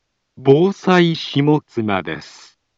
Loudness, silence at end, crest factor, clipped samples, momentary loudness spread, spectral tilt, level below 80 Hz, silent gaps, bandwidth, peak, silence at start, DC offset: -16 LUFS; 0.5 s; 18 dB; under 0.1%; 9 LU; -7 dB/octave; -60 dBFS; none; 7.8 kHz; 0 dBFS; 0.4 s; under 0.1%